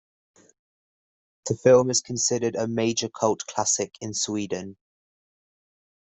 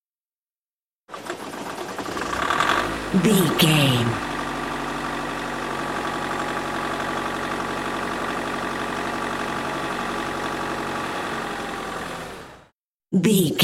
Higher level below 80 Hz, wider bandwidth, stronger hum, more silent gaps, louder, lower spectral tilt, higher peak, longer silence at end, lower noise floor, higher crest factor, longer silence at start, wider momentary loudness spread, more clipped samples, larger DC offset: second, -64 dBFS vs -48 dBFS; second, 8.4 kHz vs 16.5 kHz; neither; second, none vs 12.72-12.98 s; about the same, -24 LUFS vs -24 LUFS; about the same, -3.5 dB/octave vs -4.5 dB/octave; about the same, -6 dBFS vs -4 dBFS; first, 1.4 s vs 0 s; about the same, under -90 dBFS vs under -90 dBFS; about the same, 22 dB vs 20 dB; first, 1.45 s vs 1.1 s; about the same, 13 LU vs 13 LU; neither; neither